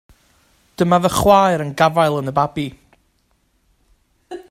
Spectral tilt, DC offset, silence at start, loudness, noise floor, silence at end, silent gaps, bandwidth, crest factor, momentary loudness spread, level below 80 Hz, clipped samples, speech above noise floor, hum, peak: -5.5 dB/octave; under 0.1%; 0.8 s; -16 LUFS; -63 dBFS; 0.1 s; none; 16 kHz; 18 dB; 16 LU; -44 dBFS; under 0.1%; 47 dB; none; 0 dBFS